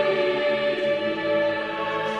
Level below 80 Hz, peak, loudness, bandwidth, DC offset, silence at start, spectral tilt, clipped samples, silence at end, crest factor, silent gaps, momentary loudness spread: -62 dBFS; -10 dBFS; -24 LUFS; 8.6 kHz; under 0.1%; 0 s; -5.5 dB/octave; under 0.1%; 0 s; 14 dB; none; 4 LU